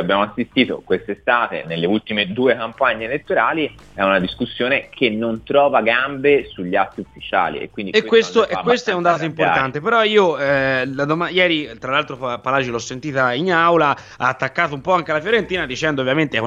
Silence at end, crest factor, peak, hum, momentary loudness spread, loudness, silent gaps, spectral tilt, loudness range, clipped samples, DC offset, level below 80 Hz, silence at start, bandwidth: 0 s; 18 dB; -2 dBFS; none; 8 LU; -18 LUFS; none; -5 dB/octave; 2 LU; under 0.1%; under 0.1%; -52 dBFS; 0 s; 7.8 kHz